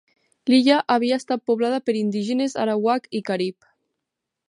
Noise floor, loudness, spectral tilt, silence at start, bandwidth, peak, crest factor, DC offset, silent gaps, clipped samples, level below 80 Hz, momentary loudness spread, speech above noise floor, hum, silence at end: -83 dBFS; -22 LUFS; -5 dB/octave; 0.45 s; 11 kHz; -4 dBFS; 18 dB; under 0.1%; none; under 0.1%; -74 dBFS; 9 LU; 62 dB; none; 1 s